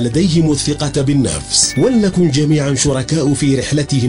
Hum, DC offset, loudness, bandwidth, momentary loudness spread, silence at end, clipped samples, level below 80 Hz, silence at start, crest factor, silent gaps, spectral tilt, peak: none; 0.4%; -14 LUFS; 11 kHz; 4 LU; 0 s; under 0.1%; -34 dBFS; 0 s; 14 dB; none; -5 dB/octave; 0 dBFS